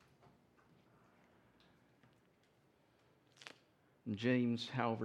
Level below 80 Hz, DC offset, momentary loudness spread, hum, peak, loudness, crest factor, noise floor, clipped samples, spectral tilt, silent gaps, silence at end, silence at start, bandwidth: -86 dBFS; under 0.1%; 22 LU; none; -20 dBFS; -38 LUFS; 24 dB; -73 dBFS; under 0.1%; -6.5 dB/octave; none; 0 s; 3.4 s; 9.8 kHz